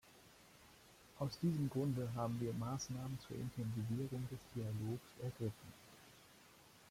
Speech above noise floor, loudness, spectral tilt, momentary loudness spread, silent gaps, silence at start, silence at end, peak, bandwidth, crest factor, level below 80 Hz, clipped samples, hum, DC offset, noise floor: 22 dB; -44 LUFS; -7 dB/octave; 23 LU; none; 0.05 s; 0 s; -28 dBFS; 16.5 kHz; 16 dB; -70 dBFS; under 0.1%; none; under 0.1%; -65 dBFS